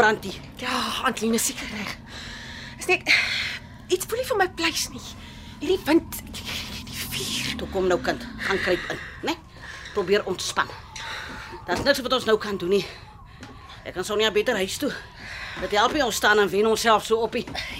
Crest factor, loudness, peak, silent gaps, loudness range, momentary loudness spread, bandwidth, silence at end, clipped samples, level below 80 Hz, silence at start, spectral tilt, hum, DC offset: 22 dB; -24 LUFS; -4 dBFS; none; 4 LU; 16 LU; 16 kHz; 0 s; under 0.1%; -48 dBFS; 0 s; -3 dB/octave; none; under 0.1%